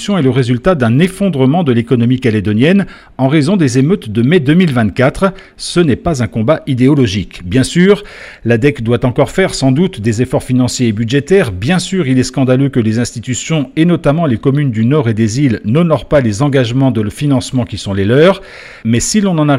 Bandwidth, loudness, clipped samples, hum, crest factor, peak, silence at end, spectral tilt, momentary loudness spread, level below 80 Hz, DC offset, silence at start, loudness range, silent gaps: 13.5 kHz; -12 LUFS; under 0.1%; none; 12 dB; 0 dBFS; 0 s; -6 dB/octave; 6 LU; -36 dBFS; under 0.1%; 0 s; 1 LU; none